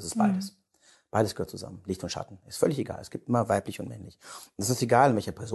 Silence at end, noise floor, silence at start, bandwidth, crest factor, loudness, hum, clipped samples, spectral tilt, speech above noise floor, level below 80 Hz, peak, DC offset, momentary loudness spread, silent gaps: 0 s; -63 dBFS; 0 s; 12.5 kHz; 22 dB; -28 LUFS; none; under 0.1%; -5.5 dB/octave; 35 dB; -56 dBFS; -6 dBFS; under 0.1%; 18 LU; none